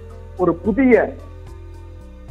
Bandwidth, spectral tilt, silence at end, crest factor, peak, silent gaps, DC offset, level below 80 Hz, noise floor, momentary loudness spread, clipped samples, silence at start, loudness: 6.8 kHz; -9 dB/octave; 0 s; 20 dB; 0 dBFS; none; under 0.1%; -38 dBFS; -37 dBFS; 25 LU; under 0.1%; 0 s; -17 LUFS